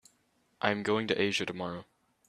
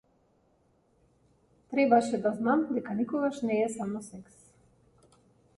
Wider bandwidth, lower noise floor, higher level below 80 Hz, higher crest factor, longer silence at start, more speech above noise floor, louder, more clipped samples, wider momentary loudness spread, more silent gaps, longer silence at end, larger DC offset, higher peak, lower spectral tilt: first, 13 kHz vs 11.5 kHz; first, -72 dBFS vs -68 dBFS; about the same, -70 dBFS vs -70 dBFS; about the same, 26 dB vs 22 dB; second, 0.6 s vs 1.7 s; about the same, 41 dB vs 40 dB; about the same, -31 LUFS vs -29 LUFS; neither; second, 10 LU vs 13 LU; neither; second, 0.45 s vs 1.35 s; neither; about the same, -8 dBFS vs -10 dBFS; second, -4.5 dB/octave vs -6 dB/octave